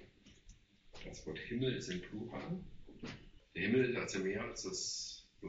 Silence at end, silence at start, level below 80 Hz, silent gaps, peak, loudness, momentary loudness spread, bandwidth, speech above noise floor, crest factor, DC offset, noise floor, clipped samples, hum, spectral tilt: 0 s; 0 s; -62 dBFS; none; -22 dBFS; -40 LUFS; 18 LU; 8 kHz; 23 dB; 20 dB; under 0.1%; -62 dBFS; under 0.1%; none; -4.5 dB/octave